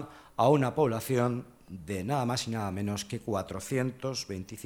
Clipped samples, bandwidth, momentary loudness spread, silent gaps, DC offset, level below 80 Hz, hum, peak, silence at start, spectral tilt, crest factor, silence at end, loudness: under 0.1%; 19 kHz; 13 LU; none; under 0.1%; -62 dBFS; none; -12 dBFS; 0 s; -5.5 dB/octave; 20 dB; 0 s; -31 LUFS